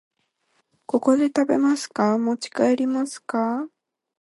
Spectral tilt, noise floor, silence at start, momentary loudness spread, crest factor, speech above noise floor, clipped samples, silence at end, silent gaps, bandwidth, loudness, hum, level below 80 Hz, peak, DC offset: -5 dB/octave; -69 dBFS; 0.95 s; 7 LU; 18 dB; 48 dB; under 0.1%; 0.55 s; none; 11.5 kHz; -22 LUFS; none; -72 dBFS; -6 dBFS; under 0.1%